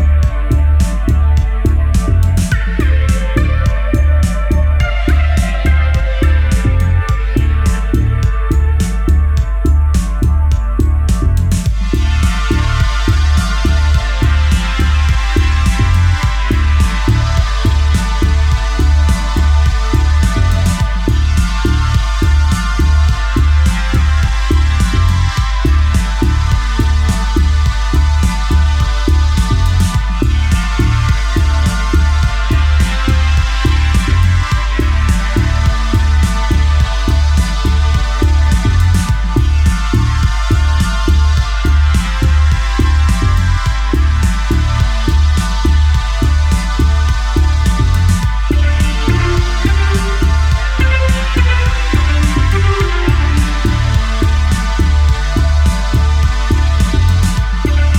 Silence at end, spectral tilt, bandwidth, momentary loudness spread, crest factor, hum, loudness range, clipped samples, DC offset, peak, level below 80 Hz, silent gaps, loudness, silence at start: 0 s; -5.5 dB/octave; 13 kHz; 2 LU; 10 dB; none; 1 LU; under 0.1%; under 0.1%; -2 dBFS; -12 dBFS; none; -13 LUFS; 0 s